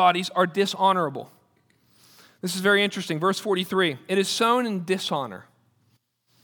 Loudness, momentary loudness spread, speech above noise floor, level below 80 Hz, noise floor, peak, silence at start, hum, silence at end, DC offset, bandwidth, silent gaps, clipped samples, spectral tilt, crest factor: -23 LUFS; 10 LU; 44 dB; -80 dBFS; -67 dBFS; -6 dBFS; 0 s; none; 1 s; under 0.1%; over 20 kHz; none; under 0.1%; -4 dB/octave; 20 dB